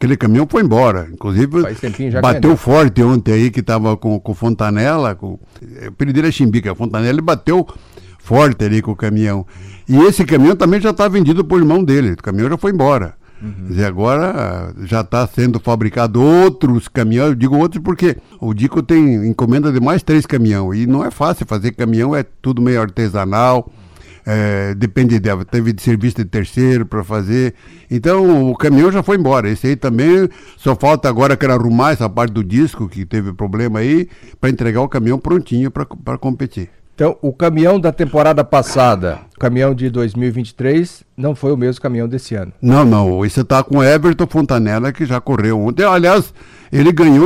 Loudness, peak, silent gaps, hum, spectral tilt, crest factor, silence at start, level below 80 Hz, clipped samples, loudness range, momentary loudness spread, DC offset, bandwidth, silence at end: -14 LUFS; -2 dBFS; none; none; -7.5 dB/octave; 10 dB; 0 s; -38 dBFS; under 0.1%; 4 LU; 10 LU; under 0.1%; 15.5 kHz; 0 s